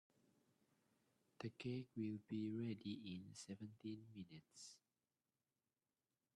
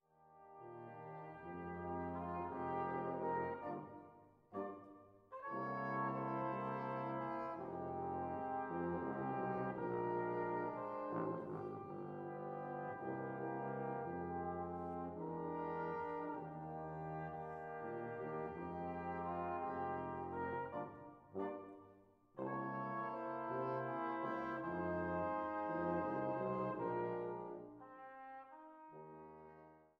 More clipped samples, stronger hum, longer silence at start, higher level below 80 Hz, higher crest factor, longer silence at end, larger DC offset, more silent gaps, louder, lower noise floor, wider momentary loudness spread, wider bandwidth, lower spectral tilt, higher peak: neither; neither; first, 1.4 s vs 0.2 s; second, -88 dBFS vs -74 dBFS; about the same, 18 dB vs 16 dB; first, 1.6 s vs 0.15 s; neither; neither; second, -52 LUFS vs -44 LUFS; first, under -90 dBFS vs -67 dBFS; second, 12 LU vs 15 LU; first, 12 kHz vs 5.8 kHz; about the same, -6 dB/octave vs -7 dB/octave; second, -36 dBFS vs -28 dBFS